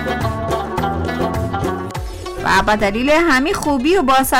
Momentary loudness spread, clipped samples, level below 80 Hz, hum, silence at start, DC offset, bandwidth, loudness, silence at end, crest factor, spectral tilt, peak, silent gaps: 10 LU; under 0.1%; -32 dBFS; none; 0 s; under 0.1%; 19 kHz; -17 LUFS; 0 s; 10 dB; -5 dB/octave; -6 dBFS; none